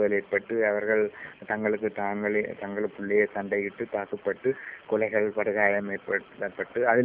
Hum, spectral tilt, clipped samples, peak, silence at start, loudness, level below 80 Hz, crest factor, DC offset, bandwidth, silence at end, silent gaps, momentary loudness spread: none; -10 dB/octave; under 0.1%; -8 dBFS; 0 s; -28 LUFS; -66 dBFS; 20 dB; under 0.1%; 3.7 kHz; 0 s; none; 8 LU